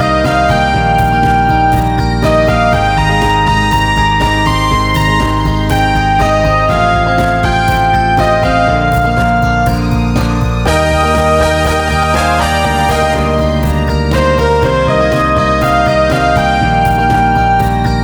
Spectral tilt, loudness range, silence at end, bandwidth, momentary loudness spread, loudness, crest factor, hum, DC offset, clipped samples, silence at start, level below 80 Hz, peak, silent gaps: -6 dB/octave; 1 LU; 0 s; over 20 kHz; 2 LU; -11 LUFS; 10 dB; none; under 0.1%; under 0.1%; 0 s; -20 dBFS; 0 dBFS; none